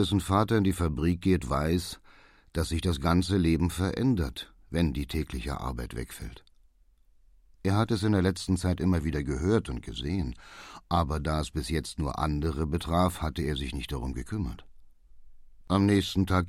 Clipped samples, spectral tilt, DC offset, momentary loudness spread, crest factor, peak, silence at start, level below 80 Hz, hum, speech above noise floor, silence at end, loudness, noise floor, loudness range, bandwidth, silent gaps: under 0.1%; -6.5 dB/octave; under 0.1%; 12 LU; 20 dB; -10 dBFS; 0 s; -40 dBFS; none; 34 dB; 0 s; -29 LUFS; -61 dBFS; 4 LU; 15.5 kHz; none